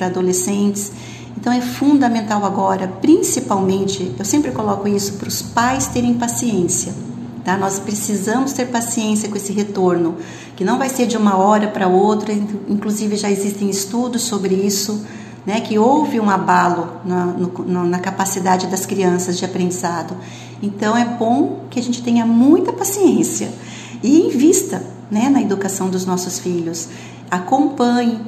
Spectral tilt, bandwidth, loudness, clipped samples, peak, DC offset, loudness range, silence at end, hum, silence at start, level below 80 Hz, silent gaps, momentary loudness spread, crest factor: -4.5 dB/octave; 14 kHz; -17 LUFS; under 0.1%; 0 dBFS; under 0.1%; 3 LU; 0 s; none; 0 s; -52 dBFS; none; 10 LU; 16 dB